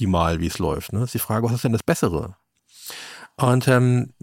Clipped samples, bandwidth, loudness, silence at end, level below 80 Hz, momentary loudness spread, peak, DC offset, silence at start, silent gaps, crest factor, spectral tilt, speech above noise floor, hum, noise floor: under 0.1%; 17 kHz; -21 LUFS; 0.15 s; -42 dBFS; 19 LU; -4 dBFS; under 0.1%; 0 s; none; 18 dB; -6 dB/octave; 23 dB; none; -44 dBFS